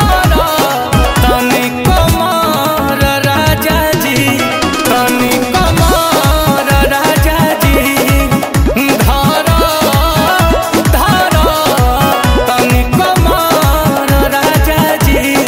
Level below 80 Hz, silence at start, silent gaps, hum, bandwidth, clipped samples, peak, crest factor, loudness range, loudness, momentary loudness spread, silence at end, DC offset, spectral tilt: -18 dBFS; 0 s; none; none; 16.5 kHz; under 0.1%; 0 dBFS; 10 dB; 1 LU; -10 LUFS; 2 LU; 0 s; 0.2%; -4.5 dB/octave